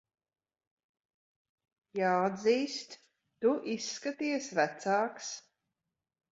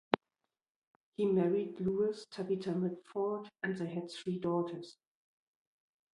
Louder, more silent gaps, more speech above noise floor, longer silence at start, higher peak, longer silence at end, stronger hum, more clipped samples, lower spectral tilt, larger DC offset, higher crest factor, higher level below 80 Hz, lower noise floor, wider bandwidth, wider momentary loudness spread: first, -32 LUFS vs -36 LUFS; second, none vs 0.70-1.12 s; about the same, 57 dB vs 54 dB; first, 1.95 s vs 0.1 s; second, -14 dBFS vs -6 dBFS; second, 0.9 s vs 1.2 s; neither; neither; second, -4 dB/octave vs -7.5 dB/octave; neither; second, 20 dB vs 30 dB; second, -82 dBFS vs -74 dBFS; about the same, -88 dBFS vs -89 dBFS; second, 8 kHz vs 11.5 kHz; first, 13 LU vs 10 LU